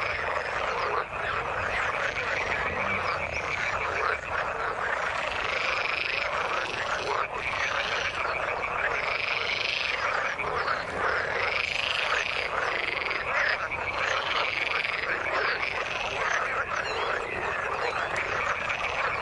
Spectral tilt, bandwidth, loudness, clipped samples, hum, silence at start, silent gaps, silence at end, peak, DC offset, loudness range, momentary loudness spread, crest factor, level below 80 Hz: -2.5 dB/octave; 11.5 kHz; -27 LUFS; under 0.1%; none; 0 s; none; 0 s; -10 dBFS; under 0.1%; 1 LU; 3 LU; 18 dB; -52 dBFS